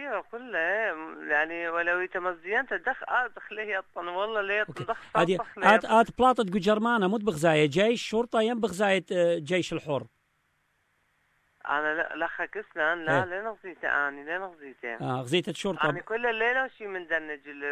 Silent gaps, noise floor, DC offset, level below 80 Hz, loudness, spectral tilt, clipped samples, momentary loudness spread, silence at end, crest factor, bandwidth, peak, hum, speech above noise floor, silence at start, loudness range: none; -72 dBFS; under 0.1%; -64 dBFS; -27 LUFS; -5 dB/octave; under 0.1%; 11 LU; 0 s; 20 dB; 14 kHz; -8 dBFS; none; 45 dB; 0 s; 7 LU